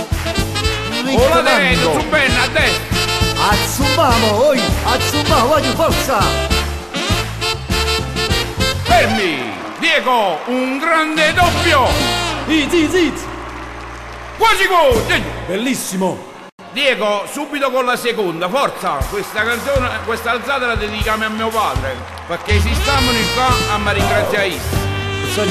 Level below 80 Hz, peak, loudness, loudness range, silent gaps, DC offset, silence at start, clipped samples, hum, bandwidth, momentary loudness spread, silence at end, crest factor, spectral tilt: -28 dBFS; -2 dBFS; -15 LUFS; 4 LU; 16.52-16.58 s; under 0.1%; 0 s; under 0.1%; none; 14 kHz; 9 LU; 0 s; 14 dB; -4 dB/octave